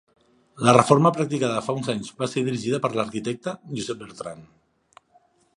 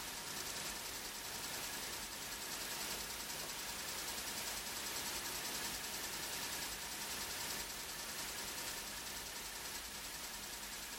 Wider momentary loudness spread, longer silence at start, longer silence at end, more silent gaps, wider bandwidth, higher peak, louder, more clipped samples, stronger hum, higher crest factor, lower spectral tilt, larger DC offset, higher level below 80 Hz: first, 15 LU vs 4 LU; first, 0.55 s vs 0 s; first, 1.1 s vs 0 s; neither; second, 11.5 kHz vs 17 kHz; first, 0 dBFS vs -28 dBFS; first, -23 LUFS vs -42 LUFS; neither; neither; first, 24 dB vs 16 dB; first, -5.5 dB/octave vs -0.5 dB/octave; neither; about the same, -62 dBFS vs -64 dBFS